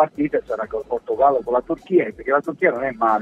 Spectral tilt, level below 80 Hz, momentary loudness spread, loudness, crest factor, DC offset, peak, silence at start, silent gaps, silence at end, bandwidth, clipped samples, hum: -8 dB/octave; -52 dBFS; 8 LU; -21 LUFS; 18 dB; under 0.1%; -2 dBFS; 0 s; none; 0 s; 7.6 kHz; under 0.1%; none